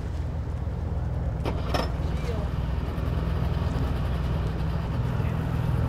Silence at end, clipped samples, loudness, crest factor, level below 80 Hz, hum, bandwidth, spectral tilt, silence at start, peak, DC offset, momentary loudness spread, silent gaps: 0 s; under 0.1%; -29 LUFS; 18 dB; -32 dBFS; none; 14.5 kHz; -7.5 dB/octave; 0 s; -10 dBFS; under 0.1%; 4 LU; none